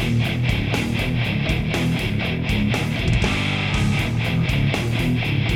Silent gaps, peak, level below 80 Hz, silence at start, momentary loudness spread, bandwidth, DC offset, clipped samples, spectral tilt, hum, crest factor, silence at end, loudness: none; -4 dBFS; -32 dBFS; 0 s; 2 LU; 16.5 kHz; under 0.1%; under 0.1%; -6 dB/octave; none; 16 dB; 0 s; -21 LUFS